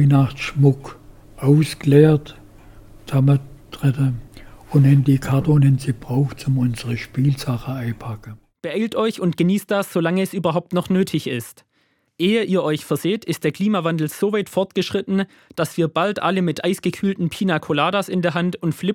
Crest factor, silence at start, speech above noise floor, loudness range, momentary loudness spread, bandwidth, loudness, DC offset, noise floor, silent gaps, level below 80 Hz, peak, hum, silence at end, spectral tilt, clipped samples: 18 dB; 0 s; 46 dB; 4 LU; 10 LU; 16.5 kHz; -20 LUFS; under 0.1%; -65 dBFS; none; -48 dBFS; -2 dBFS; none; 0 s; -7 dB/octave; under 0.1%